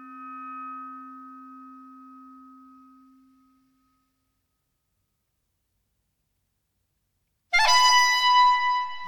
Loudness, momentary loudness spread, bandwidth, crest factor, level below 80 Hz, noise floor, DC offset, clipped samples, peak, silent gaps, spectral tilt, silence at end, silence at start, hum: -19 LUFS; 25 LU; 18 kHz; 22 dB; -58 dBFS; -77 dBFS; under 0.1%; under 0.1%; -6 dBFS; none; 1.5 dB/octave; 0 s; 0 s; none